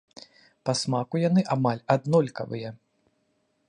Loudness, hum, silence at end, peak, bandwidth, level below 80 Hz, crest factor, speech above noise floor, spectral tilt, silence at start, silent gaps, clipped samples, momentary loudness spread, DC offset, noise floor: -26 LUFS; none; 0.95 s; -8 dBFS; 11 kHz; -70 dBFS; 20 dB; 47 dB; -6 dB/octave; 0.65 s; none; under 0.1%; 12 LU; under 0.1%; -72 dBFS